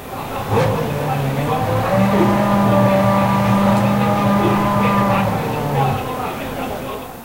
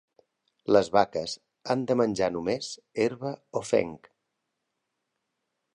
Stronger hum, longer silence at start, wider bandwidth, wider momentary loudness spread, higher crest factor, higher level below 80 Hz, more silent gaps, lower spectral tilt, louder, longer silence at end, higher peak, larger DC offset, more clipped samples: neither; second, 0 s vs 0.7 s; first, 16 kHz vs 11 kHz; second, 10 LU vs 13 LU; second, 14 dB vs 22 dB; first, -40 dBFS vs -64 dBFS; neither; first, -7 dB/octave vs -5 dB/octave; first, -17 LUFS vs -27 LUFS; second, 0 s vs 1.8 s; first, -2 dBFS vs -6 dBFS; first, 0.4% vs under 0.1%; neither